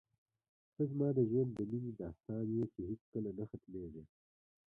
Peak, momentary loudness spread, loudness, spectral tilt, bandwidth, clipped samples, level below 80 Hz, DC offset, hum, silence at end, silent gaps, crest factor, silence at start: -22 dBFS; 14 LU; -40 LUFS; -13 dB/octave; 3.3 kHz; under 0.1%; -66 dBFS; under 0.1%; none; 0.7 s; 3.01-3.12 s; 18 dB; 0.8 s